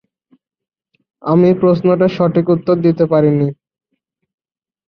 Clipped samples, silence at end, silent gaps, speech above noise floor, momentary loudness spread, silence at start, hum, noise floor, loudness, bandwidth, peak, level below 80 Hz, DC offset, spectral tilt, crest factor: under 0.1%; 1.35 s; none; 59 dB; 5 LU; 1.25 s; none; -72 dBFS; -13 LUFS; 6 kHz; -2 dBFS; -54 dBFS; under 0.1%; -10.5 dB/octave; 14 dB